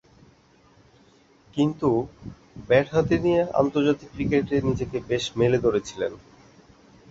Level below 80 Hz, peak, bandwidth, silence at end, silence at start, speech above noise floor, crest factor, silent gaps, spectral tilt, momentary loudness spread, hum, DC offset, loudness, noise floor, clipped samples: -50 dBFS; -6 dBFS; 8 kHz; 0.95 s; 1.55 s; 34 dB; 18 dB; none; -6.5 dB/octave; 11 LU; none; under 0.1%; -24 LUFS; -57 dBFS; under 0.1%